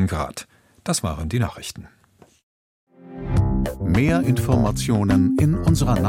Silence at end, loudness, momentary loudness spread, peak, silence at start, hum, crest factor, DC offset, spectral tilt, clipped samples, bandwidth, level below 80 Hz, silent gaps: 0 s; -21 LUFS; 16 LU; -4 dBFS; 0 s; none; 16 dB; under 0.1%; -6.5 dB/octave; under 0.1%; 16.5 kHz; -32 dBFS; 2.43-2.87 s